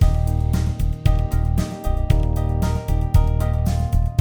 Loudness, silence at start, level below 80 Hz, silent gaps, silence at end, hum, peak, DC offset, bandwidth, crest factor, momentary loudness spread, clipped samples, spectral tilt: -21 LUFS; 0 s; -20 dBFS; none; 0 s; none; -2 dBFS; under 0.1%; 19.5 kHz; 16 dB; 4 LU; under 0.1%; -7.5 dB/octave